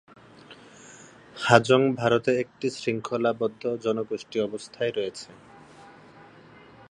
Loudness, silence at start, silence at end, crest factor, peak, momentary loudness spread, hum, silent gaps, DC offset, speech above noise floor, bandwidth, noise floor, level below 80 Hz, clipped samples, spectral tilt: -25 LUFS; 0.5 s; 0.65 s; 26 dB; 0 dBFS; 25 LU; none; none; under 0.1%; 26 dB; 11 kHz; -51 dBFS; -66 dBFS; under 0.1%; -5.5 dB/octave